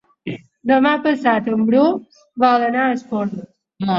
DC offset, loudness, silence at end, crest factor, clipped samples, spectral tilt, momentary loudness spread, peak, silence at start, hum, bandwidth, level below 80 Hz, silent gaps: under 0.1%; -17 LUFS; 0 s; 16 dB; under 0.1%; -7 dB/octave; 16 LU; -2 dBFS; 0.25 s; none; 7.4 kHz; -64 dBFS; none